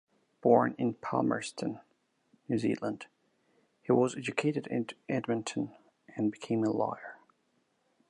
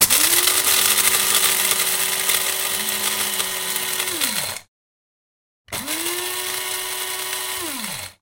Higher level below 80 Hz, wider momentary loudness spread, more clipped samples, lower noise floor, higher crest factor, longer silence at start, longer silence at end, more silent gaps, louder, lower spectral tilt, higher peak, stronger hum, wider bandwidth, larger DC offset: second, -76 dBFS vs -58 dBFS; first, 18 LU vs 11 LU; neither; second, -75 dBFS vs under -90 dBFS; about the same, 24 dB vs 22 dB; first, 0.45 s vs 0 s; first, 0.95 s vs 0.1 s; second, none vs 4.68-5.65 s; second, -32 LUFS vs -18 LUFS; first, -6 dB/octave vs 1 dB/octave; second, -10 dBFS vs 0 dBFS; neither; second, 10.5 kHz vs 17 kHz; neither